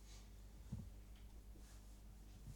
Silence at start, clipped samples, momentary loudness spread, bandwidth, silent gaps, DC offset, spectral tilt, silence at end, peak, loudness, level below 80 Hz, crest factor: 0 s; under 0.1%; 7 LU; 19 kHz; none; under 0.1%; -5.5 dB/octave; 0 s; -38 dBFS; -59 LUFS; -58 dBFS; 20 dB